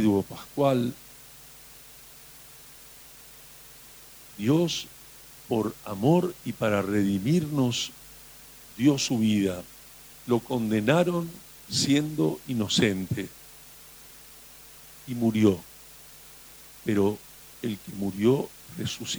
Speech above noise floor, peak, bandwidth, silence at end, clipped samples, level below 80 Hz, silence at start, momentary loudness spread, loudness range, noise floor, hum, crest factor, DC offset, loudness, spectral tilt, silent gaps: 23 dB; -8 dBFS; over 20 kHz; 0 s; under 0.1%; -60 dBFS; 0 s; 22 LU; 6 LU; -49 dBFS; none; 20 dB; under 0.1%; -26 LUFS; -5.5 dB/octave; none